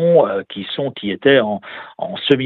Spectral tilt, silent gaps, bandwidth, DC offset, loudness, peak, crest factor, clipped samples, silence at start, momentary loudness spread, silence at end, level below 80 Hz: -8 dB/octave; none; 4.5 kHz; under 0.1%; -18 LUFS; 0 dBFS; 16 dB; under 0.1%; 0 s; 13 LU; 0 s; -62 dBFS